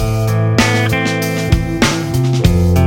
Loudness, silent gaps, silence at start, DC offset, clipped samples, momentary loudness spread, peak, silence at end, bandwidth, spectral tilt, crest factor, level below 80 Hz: -14 LUFS; none; 0 s; under 0.1%; under 0.1%; 4 LU; 0 dBFS; 0 s; 17 kHz; -5.5 dB/octave; 12 dB; -24 dBFS